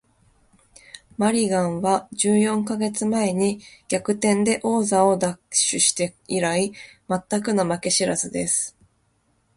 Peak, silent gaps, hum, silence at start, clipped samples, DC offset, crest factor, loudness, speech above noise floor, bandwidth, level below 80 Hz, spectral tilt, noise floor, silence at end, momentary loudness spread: -4 dBFS; none; none; 0.95 s; under 0.1%; under 0.1%; 18 dB; -22 LUFS; 44 dB; 11.5 kHz; -60 dBFS; -3.5 dB/octave; -66 dBFS; 0.85 s; 9 LU